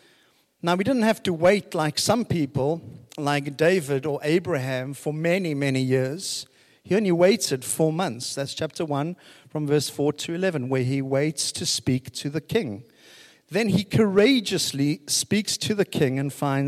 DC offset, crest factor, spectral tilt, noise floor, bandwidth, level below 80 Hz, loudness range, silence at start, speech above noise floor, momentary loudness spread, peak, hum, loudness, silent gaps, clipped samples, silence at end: under 0.1%; 16 dB; -4.5 dB/octave; -62 dBFS; 15.5 kHz; -60 dBFS; 3 LU; 0.65 s; 38 dB; 10 LU; -8 dBFS; none; -24 LUFS; none; under 0.1%; 0 s